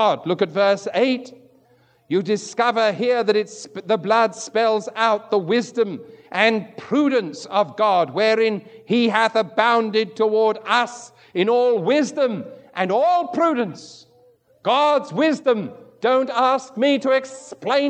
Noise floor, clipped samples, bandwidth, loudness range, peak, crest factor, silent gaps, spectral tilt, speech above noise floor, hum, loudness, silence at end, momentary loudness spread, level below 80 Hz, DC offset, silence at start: -58 dBFS; under 0.1%; 9.4 kHz; 2 LU; -2 dBFS; 18 dB; none; -4.5 dB/octave; 38 dB; none; -20 LUFS; 0 s; 9 LU; -80 dBFS; under 0.1%; 0 s